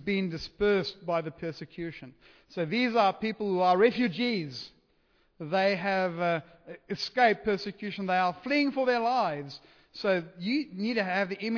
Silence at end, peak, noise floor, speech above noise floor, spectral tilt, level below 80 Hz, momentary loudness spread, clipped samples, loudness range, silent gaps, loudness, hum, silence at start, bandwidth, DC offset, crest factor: 0 s; -10 dBFS; -68 dBFS; 39 dB; -6 dB/octave; -62 dBFS; 15 LU; under 0.1%; 2 LU; none; -29 LUFS; none; 0 s; 5.4 kHz; under 0.1%; 18 dB